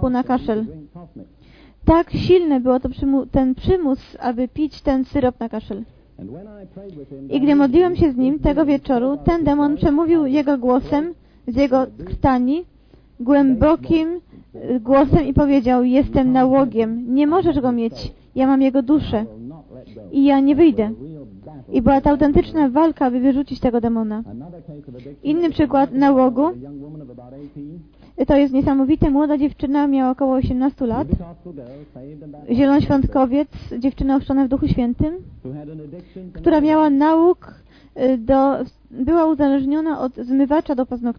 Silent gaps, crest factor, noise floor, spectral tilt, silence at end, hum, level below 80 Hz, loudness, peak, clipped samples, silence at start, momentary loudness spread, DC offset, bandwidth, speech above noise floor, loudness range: none; 18 dB; -47 dBFS; -9.5 dB/octave; 0.05 s; none; -36 dBFS; -18 LUFS; 0 dBFS; under 0.1%; 0 s; 21 LU; under 0.1%; 5.4 kHz; 30 dB; 4 LU